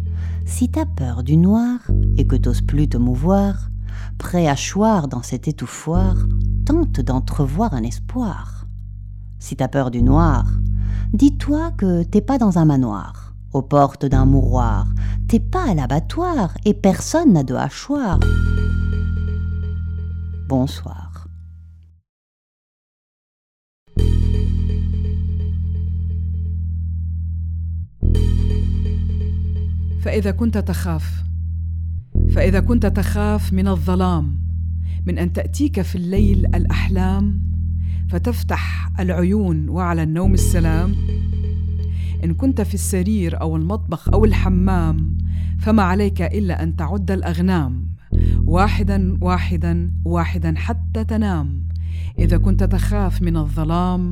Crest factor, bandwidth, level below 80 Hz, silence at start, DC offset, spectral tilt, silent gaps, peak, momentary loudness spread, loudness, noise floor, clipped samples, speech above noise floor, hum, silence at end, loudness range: 18 dB; 14 kHz; -24 dBFS; 0 s; under 0.1%; -7.5 dB/octave; 22.09-23.86 s; 0 dBFS; 9 LU; -19 LUFS; -43 dBFS; under 0.1%; 26 dB; none; 0 s; 5 LU